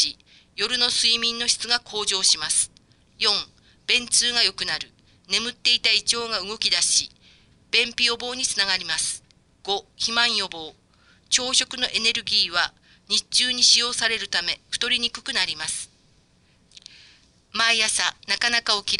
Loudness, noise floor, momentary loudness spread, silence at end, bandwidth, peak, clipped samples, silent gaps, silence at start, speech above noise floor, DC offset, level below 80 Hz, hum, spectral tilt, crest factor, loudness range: -21 LUFS; -60 dBFS; 10 LU; 0 s; 11.5 kHz; -4 dBFS; under 0.1%; none; 0 s; 37 dB; under 0.1%; -58 dBFS; none; 1 dB/octave; 20 dB; 5 LU